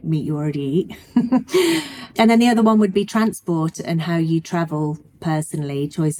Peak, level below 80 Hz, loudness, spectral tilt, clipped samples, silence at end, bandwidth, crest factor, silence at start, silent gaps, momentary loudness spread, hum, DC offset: -4 dBFS; -58 dBFS; -19 LUFS; -6 dB/octave; under 0.1%; 0 s; 16.5 kHz; 16 dB; 0.05 s; none; 10 LU; none; under 0.1%